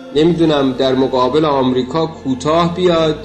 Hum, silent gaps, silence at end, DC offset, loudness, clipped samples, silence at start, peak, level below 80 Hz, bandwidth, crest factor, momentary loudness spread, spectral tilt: none; none; 0 s; under 0.1%; -14 LUFS; under 0.1%; 0 s; -4 dBFS; -42 dBFS; 8.8 kHz; 10 dB; 6 LU; -6.5 dB/octave